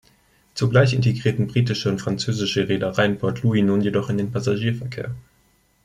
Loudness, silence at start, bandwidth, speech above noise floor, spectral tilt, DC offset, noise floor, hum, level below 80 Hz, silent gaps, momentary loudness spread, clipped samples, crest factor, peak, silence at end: -21 LUFS; 0.55 s; 11.5 kHz; 40 dB; -6.5 dB/octave; under 0.1%; -61 dBFS; none; -52 dBFS; none; 10 LU; under 0.1%; 18 dB; -4 dBFS; 0.65 s